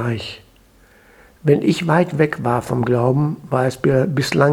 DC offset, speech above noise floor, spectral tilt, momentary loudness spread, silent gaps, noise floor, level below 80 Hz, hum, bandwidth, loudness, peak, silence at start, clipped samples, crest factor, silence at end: under 0.1%; 34 dB; -7 dB/octave; 8 LU; none; -51 dBFS; -50 dBFS; none; 15 kHz; -18 LUFS; 0 dBFS; 0 s; under 0.1%; 18 dB; 0 s